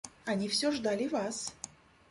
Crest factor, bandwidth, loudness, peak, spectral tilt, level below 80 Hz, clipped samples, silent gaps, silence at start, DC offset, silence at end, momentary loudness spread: 16 dB; 11.5 kHz; -33 LUFS; -18 dBFS; -3.5 dB/octave; -68 dBFS; under 0.1%; none; 0.05 s; under 0.1%; 0.4 s; 13 LU